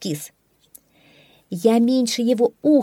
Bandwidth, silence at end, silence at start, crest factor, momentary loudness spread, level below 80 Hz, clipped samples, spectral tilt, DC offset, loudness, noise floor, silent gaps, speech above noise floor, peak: 16.5 kHz; 0 s; 0 s; 16 dB; 15 LU; -72 dBFS; under 0.1%; -5 dB/octave; under 0.1%; -19 LUFS; -54 dBFS; none; 36 dB; -4 dBFS